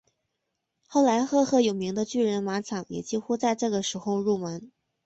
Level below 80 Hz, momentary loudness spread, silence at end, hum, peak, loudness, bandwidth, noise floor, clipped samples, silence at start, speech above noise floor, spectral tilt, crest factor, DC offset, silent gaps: -68 dBFS; 9 LU; 0.4 s; none; -10 dBFS; -26 LUFS; 8.2 kHz; -81 dBFS; under 0.1%; 0.9 s; 55 dB; -5 dB/octave; 16 dB; under 0.1%; none